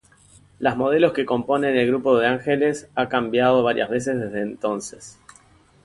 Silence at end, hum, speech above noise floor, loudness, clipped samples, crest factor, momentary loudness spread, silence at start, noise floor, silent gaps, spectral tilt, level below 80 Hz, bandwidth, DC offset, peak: 0.75 s; none; 33 dB; -21 LUFS; under 0.1%; 18 dB; 8 LU; 0.6 s; -54 dBFS; none; -5.5 dB/octave; -58 dBFS; 11.5 kHz; under 0.1%; -4 dBFS